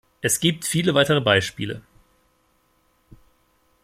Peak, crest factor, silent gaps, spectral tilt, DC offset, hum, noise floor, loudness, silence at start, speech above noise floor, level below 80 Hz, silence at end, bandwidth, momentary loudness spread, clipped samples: -2 dBFS; 22 dB; none; -3.5 dB/octave; under 0.1%; none; -64 dBFS; -20 LUFS; 0.25 s; 44 dB; -58 dBFS; 2.05 s; 16 kHz; 13 LU; under 0.1%